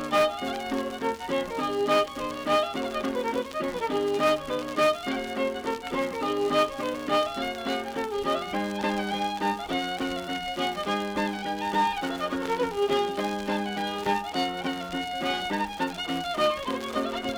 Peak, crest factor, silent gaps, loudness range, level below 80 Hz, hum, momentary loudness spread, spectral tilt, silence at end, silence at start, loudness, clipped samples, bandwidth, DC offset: -12 dBFS; 16 dB; none; 2 LU; -56 dBFS; none; 6 LU; -4 dB/octave; 0 s; 0 s; -28 LUFS; under 0.1%; over 20 kHz; under 0.1%